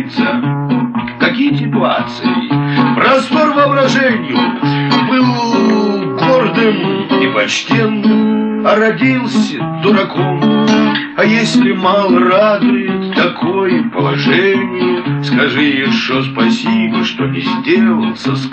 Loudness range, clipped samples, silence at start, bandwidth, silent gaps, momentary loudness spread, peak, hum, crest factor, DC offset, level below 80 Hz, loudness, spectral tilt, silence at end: 2 LU; under 0.1%; 0 s; 8.6 kHz; none; 5 LU; 0 dBFS; none; 12 dB; under 0.1%; -52 dBFS; -12 LUFS; -6 dB/octave; 0 s